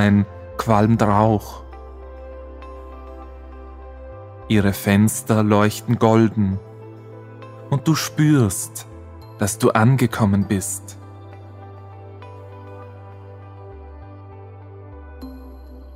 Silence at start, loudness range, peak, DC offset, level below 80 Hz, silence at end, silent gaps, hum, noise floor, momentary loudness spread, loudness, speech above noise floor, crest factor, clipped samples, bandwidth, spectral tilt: 0 s; 20 LU; 0 dBFS; under 0.1%; -42 dBFS; 0 s; none; none; -39 dBFS; 24 LU; -18 LUFS; 21 dB; 22 dB; under 0.1%; 16 kHz; -6 dB/octave